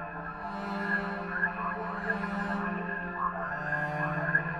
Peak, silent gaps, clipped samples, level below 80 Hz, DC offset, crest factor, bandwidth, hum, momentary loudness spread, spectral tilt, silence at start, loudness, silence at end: -12 dBFS; none; under 0.1%; -54 dBFS; under 0.1%; 20 dB; 9.4 kHz; none; 5 LU; -7.5 dB/octave; 0 s; -32 LUFS; 0 s